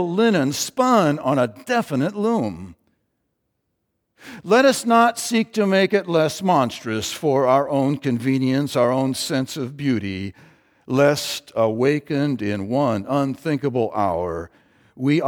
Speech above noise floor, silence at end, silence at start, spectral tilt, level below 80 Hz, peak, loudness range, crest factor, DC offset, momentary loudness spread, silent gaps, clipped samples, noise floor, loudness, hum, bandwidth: 54 dB; 0 s; 0 s; -5.5 dB/octave; -60 dBFS; -2 dBFS; 4 LU; 18 dB; under 0.1%; 9 LU; none; under 0.1%; -74 dBFS; -20 LUFS; none; 20 kHz